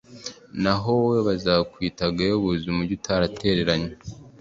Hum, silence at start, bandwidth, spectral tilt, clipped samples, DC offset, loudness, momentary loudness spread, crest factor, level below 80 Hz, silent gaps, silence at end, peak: none; 0.1 s; 7.8 kHz; -6 dB/octave; under 0.1%; under 0.1%; -23 LUFS; 13 LU; 20 dB; -46 dBFS; none; 0.1 s; -4 dBFS